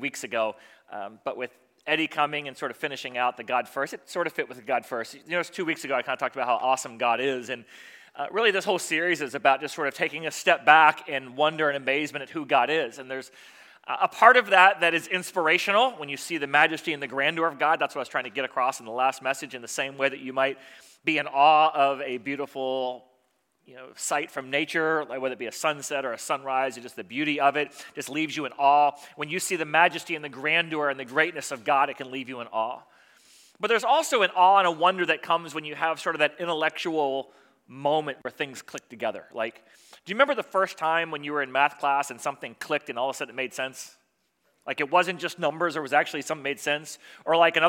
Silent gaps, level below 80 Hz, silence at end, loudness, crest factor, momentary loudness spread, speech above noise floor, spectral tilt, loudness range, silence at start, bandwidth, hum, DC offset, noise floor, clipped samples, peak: none; -82 dBFS; 0 s; -25 LUFS; 26 dB; 14 LU; 46 dB; -3 dB/octave; 7 LU; 0 s; 17 kHz; none; under 0.1%; -71 dBFS; under 0.1%; 0 dBFS